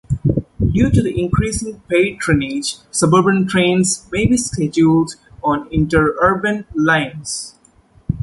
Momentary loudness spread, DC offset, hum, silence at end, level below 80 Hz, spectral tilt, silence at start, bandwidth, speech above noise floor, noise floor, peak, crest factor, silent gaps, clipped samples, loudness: 10 LU; under 0.1%; none; 0 s; -34 dBFS; -5 dB/octave; 0.1 s; 11.5 kHz; 35 dB; -51 dBFS; -2 dBFS; 14 dB; none; under 0.1%; -17 LUFS